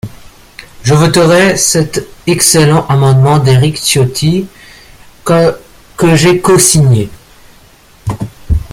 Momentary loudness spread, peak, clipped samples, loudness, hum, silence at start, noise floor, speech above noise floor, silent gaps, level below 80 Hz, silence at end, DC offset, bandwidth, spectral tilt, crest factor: 16 LU; 0 dBFS; under 0.1%; -9 LUFS; none; 0.05 s; -41 dBFS; 33 dB; none; -30 dBFS; 0 s; under 0.1%; over 20 kHz; -4.5 dB/octave; 10 dB